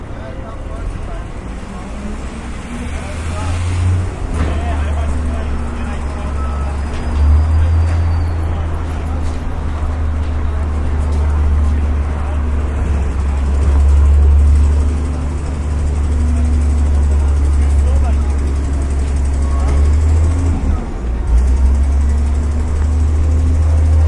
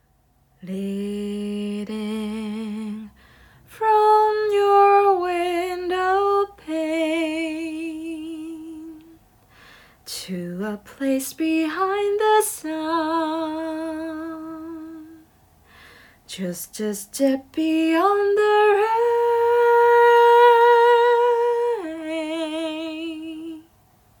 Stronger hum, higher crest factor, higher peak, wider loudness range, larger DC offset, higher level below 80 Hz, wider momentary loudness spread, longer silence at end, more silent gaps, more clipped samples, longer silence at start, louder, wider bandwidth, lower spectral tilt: neither; about the same, 12 dB vs 16 dB; first, -2 dBFS vs -6 dBFS; second, 6 LU vs 15 LU; neither; first, -16 dBFS vs -60 dBFS; second, 13 LU vs 19 LU; second, 0 s vs 0.6 s; neither; neither; second, 0 s vs 0.65 s; first, -16 LUFS vs -20 LUFS; second, 10.5 kHz vs 19.5 kHz; first, -7.5 dB/octave vs -4.5 dB/octave